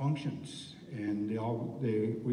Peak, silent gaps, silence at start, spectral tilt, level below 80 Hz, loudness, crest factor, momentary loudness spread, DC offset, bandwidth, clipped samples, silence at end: -22 dBFS; none; 0 s; -7.5 dB/octave; -70 dBFS; -36 LUFS; 12 dB; 12 LU; under 0.1%; 10.5 kHz; under 0.1%; 0 s